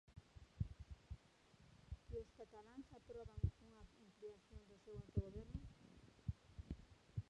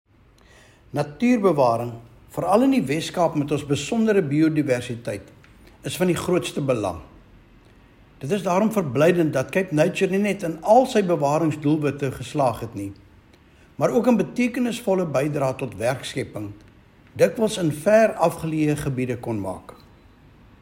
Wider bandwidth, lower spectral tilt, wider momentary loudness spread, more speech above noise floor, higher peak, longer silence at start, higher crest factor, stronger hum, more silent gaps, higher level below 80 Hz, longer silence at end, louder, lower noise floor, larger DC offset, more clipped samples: second, 9.8 kHz vs 16.5 kHz; first, -8 dB/octave vs -6 dB/octave; first, 18 LU vs 14 LU; second, 21 dB vs 32 dB; second, -28 dBFS vs -4 dBFS; second, 0.1 s vs 0.95 s; first, 24 dB vs 18 dB; neither; neither; about the same, -58 dBFS vs -54 dBFS; second, 0.05 s vs 0.9 s; second, -54 LUFS vs -22 LUFS; first, -71 dBFS vs -53 dBFS; neither; neither